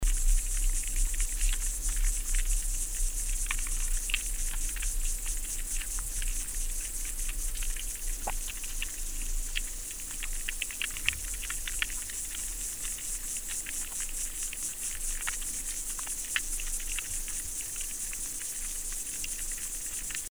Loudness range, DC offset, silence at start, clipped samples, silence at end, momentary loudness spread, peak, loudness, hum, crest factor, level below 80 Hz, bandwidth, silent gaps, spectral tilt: 3 LU; 0.3%; 0 s; under 0.1%; 0 s; 4 LU; -6 dBFS; -33 LUFS; none; 26 dB; -34 dBFS; over 20 kHz; none; -0.5 dB/octave